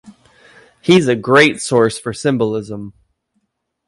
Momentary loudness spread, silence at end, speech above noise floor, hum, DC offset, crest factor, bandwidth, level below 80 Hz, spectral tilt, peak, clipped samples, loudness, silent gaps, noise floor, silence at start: 17 LU; 0.95 s; 55 dB; none; under 0.1%; 16 dB; 11.5 kHz; -54 dBFS; -5 dB/octave; 0 dBFS; under 0.1%; -14 LUFS; none; -69 dBFS; 0.05 s